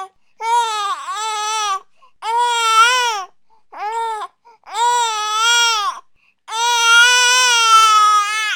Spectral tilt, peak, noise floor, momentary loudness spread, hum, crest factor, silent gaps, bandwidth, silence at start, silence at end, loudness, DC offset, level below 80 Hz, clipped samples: 4 dB/octave; 0 dBFS; -48 dBFS; 17 LU; none; 16 dB; none; 18 kHz; 0 s; 0 s; -14 LUFS; 0.2%; -66 dBFS; under 0.1%